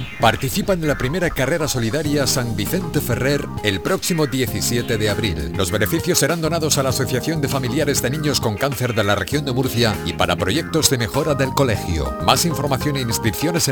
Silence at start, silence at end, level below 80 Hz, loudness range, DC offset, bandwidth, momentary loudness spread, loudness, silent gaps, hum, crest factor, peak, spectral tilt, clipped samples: 0 s; 0 s; -38 dBFS; 1 LU; under 0.1%; 19.5 kHz; 4 LU; -19 LUFS; none; none; 20 dB; 0 dBFS; -4 dB/octave; under 0.1%